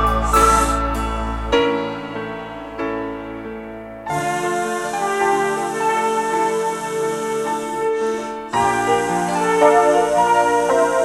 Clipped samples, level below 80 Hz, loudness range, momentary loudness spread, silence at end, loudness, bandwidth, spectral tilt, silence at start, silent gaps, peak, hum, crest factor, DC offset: under 0.1%; -32 dBFS; 7 LU; 14 LU; 0 s; -19 LUFS; 16 kHz; -4 dB/octave; 0 s; none; -2 dBFS; none; 18 dB; under 0.1%